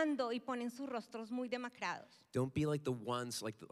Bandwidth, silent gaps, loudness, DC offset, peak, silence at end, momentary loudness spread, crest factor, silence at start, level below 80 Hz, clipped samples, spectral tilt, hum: 15 kHz; none; -41 LUFS; under 0.1%; -24 dBFS; 0.05 s; 7 LU; 16 dB; 0 s; -72 dBFS; under 0.1%; -5.5 dB/octave; none